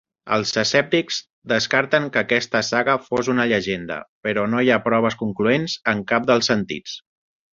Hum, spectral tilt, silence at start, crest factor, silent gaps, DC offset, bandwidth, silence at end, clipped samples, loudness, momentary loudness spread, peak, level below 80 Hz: none; -4 dB/octave; 0.25 s; 20 dB; 1.32-1.42 s, 4.09-4.21 s; under 0.1%; 7.6 kHz; 0.55 s; under 0.1%; -20 LUFS; 9 LU; -2 dBFS; -58 dBFS